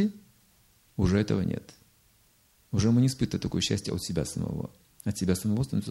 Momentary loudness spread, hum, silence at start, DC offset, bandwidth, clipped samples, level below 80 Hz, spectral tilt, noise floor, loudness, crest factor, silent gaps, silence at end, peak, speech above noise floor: 12 LU; none; 0 s; under 0.1%; 16 kHz; under 0.1%; -48 dBFS; -6 dB/octave; -64 dBFS; -29 LUFS; 18 dB; none; 0 s; -12 dBFS; 36 dB